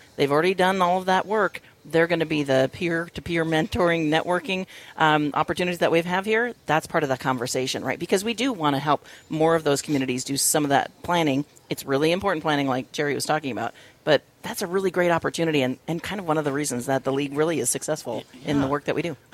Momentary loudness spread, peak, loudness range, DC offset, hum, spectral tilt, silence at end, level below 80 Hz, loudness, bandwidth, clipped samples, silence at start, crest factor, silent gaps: 8 LU; -4 dBFS; 2 LU; under 0.1%; none; -4 dB/octave; 0.2 s; -56 dBFS; -24 LUFS; 16.5 kHz; under 0.1%; 0.2 s; 20 dB; none